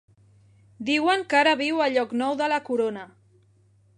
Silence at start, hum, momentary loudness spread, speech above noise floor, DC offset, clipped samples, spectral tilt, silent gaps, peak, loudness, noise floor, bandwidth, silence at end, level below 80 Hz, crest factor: 0.8 s; none; 8 LU; 37 dB; under 0.1%; under 0.1%; -3.5 dB/octave; none; -6 dBFS; -23 LUFS; -60 dBFS; 10.5 kHz; 0.9 s; -72 dBFS; 20 dB